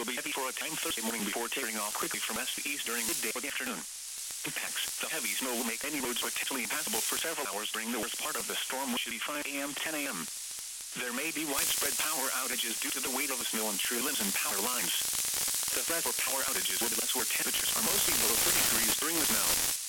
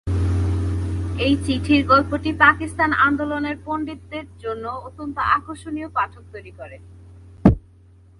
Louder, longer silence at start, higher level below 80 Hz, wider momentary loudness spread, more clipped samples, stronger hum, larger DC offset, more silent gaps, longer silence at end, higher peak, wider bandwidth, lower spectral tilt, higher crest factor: second, -30 LUFS vs -20 LUFS; about the same, 0 s vs 0.05 s; second, -64 dBFS vs -34 dBFS; second, 8 LU vs 17 LU; neither; neither; neither; neither; second, 0 s vs 0.6 s; second, -10 dBFS vs 0 dBFS; first, 17.5 kHz vs 11.5 kHz; second, 0 dB/octave vs -7 dB/octave; about the same, 22 dB vs 20 dB